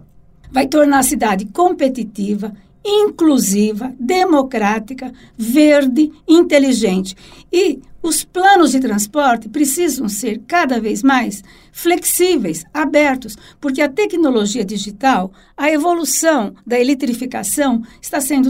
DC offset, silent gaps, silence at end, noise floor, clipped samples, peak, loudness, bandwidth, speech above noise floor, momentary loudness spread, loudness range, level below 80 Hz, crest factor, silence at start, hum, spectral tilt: under 0.1%; none; 0 s; -43 dBFS; under 0.1%; 0 dBFS; -15 LUFS; 16.5 kHz; 28 dB; 11 LU; 3 LU; -48 dBFS; 14 dB; 0.45 s; none; -3.5 dB/octave